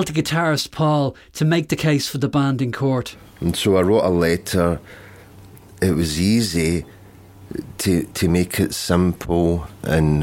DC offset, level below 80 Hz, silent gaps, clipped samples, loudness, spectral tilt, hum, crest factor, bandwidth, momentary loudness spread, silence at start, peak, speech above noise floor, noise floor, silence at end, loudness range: under 0.1%; -38 dBFS; none; under 0.1%; -20 LUFS; -5.5 dB/octave; none; 18 dB; 17 kHz; 7 LU; 0 s; -2 dBFS; 24 dB; -43 dBFS; 0 s; 3 LU